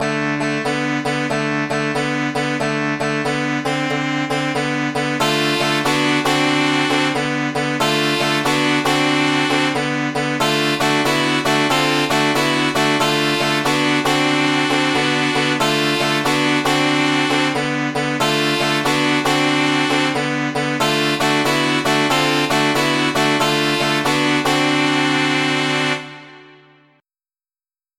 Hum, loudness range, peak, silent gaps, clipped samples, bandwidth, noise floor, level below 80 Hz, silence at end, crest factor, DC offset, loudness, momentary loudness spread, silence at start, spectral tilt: none; 4 LU; -2 dBFS; none; under 0.1%; 16.5 kHz; under -90 dBFS; -54 dBFS; 1.5 s; 14 dB; 0.2%; -17 LUFS; 4 LU; 0 s; -4 dB/octave